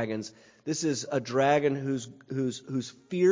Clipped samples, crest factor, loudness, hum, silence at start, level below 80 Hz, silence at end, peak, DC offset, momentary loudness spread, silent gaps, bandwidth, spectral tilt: under 0.1%; 18 dB; -29 LUFS; none; 0 s; -70 dBFS; 0 s; -10 dBFS; under 0.1%; 12 LU; none; 7.6 kHz; -5 dB/octave